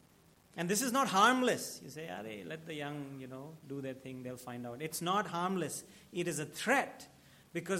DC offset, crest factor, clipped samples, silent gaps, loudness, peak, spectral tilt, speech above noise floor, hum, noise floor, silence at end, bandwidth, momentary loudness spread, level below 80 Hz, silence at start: under 0.1%; 24 dB; under 0.1%; none; -35 LUFS; -12 dBFS; -3.5 dB/octave; 29 dB; none; -65 dBFS; 0 s; 16.5 kHz; 17 LU; -78 dBFS; 0.55 s